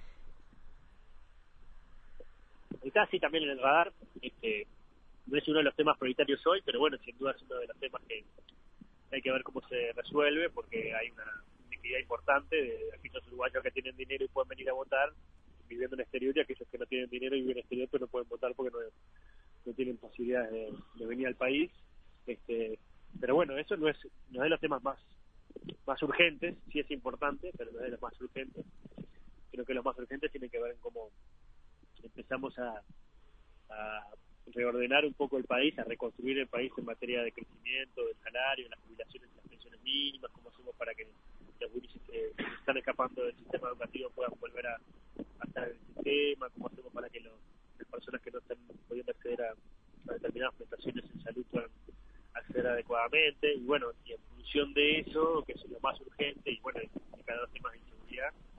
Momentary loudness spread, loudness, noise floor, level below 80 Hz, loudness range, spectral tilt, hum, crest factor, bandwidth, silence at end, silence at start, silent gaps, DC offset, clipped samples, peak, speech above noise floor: 18 LU; -35 LUFS; -60 dBFS; -58 dBFS; 9 LU; -6.5 dB/octave; none; 26 dB; 4.9 kHz; 0 s; 0 s; none; under 0.1%; under 0.1%; -10 dBFS; 24 dB